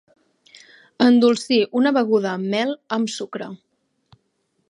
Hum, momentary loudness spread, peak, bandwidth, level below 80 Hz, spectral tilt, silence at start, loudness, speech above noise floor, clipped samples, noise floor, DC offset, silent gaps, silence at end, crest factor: none; 14 LU; -2 dBFS; 11 kHz; -74 dBFS; -5 dB/octave; 1 s; -19 LUFS; 51 dB; under 0.1%; -70 dBFS; under 0.1%; none; 1.15 s; 18 dB